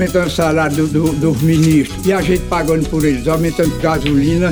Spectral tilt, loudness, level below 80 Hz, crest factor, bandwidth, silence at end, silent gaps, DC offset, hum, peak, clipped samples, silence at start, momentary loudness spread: -6.5 dB/octave; -14 LUFS; -30 dBFS; 12 dB; over 20 kHz; 0 s; none; 0.4%; none; -2 dBFS; under 0.1%; 0 s; 3 LU